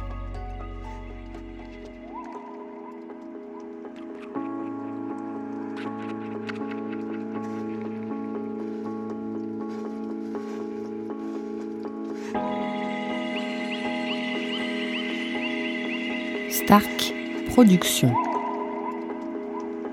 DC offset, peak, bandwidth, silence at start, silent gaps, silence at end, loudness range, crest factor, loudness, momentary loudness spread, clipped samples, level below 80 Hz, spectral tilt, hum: under 0.1%; -2 dBFS; 16 kHz; 0 s; none; 0 s; 15 LU; 26 dB; -27 LUFS; 18 LU; under 0.1%; -48 dBFS; -5 dB/octave; none